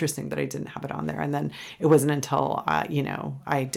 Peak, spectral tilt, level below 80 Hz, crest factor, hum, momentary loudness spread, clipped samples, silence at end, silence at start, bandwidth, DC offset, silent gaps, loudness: -6 dBFS; -5.5 dB/octave; -60 dBFS; 20 dB; none; 12 LU; under 0.1%; 0 s; 0 s; 16.5 kHz; under 0.1%; none; -26 LUFS